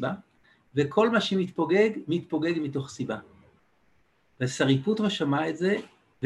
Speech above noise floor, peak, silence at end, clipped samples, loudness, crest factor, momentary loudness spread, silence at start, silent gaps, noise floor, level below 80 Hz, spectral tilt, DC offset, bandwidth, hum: 42 dB; -10 dBFS; 0 s; under 0.1%; -27 LUFS; 18 dB; 10 LU; 0 s; none; -67 dBFS; -66 dBFS; -6 dB/octave; under 0.1%; 11.5 kHz; none